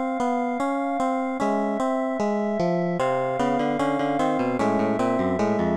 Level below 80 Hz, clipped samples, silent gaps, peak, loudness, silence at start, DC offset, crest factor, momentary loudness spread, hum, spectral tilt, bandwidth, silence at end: -56 dBFS; under 0.1%; none; -10 dBFS; -24 LUFS; 0 s; under 0.1%; 14 dB; 2 LU; none; -7 dB/octave; 11 kHz; 0 s